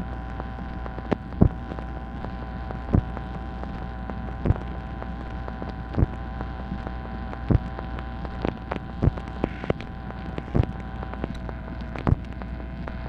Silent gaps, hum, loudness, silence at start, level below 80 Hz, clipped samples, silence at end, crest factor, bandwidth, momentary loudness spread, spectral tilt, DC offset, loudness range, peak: none; none; -30 LUFS; 0 s; -34 dBFS; under 0.1%; 0 s; 26 dB; 6.2 kHz; 9 LU; -9.5 dB/octave; under 0.1%; 2 LU; -2 dBFS